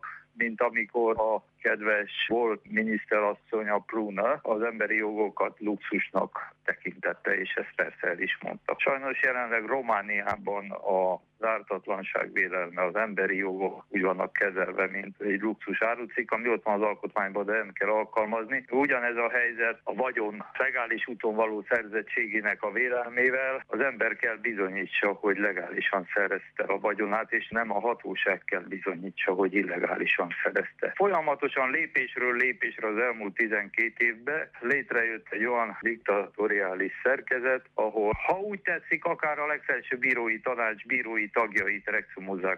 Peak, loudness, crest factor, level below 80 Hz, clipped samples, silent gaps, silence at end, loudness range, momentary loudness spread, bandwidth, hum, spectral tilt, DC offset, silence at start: -12 dBFS; -28 LUFS; 16 dB; -66 dBFS; under 0.1%; none; 0 s; 2 LU; 5 LU; 7.4 kHz; none; -6.5 dB/octave; under 0.1%; 0.05 s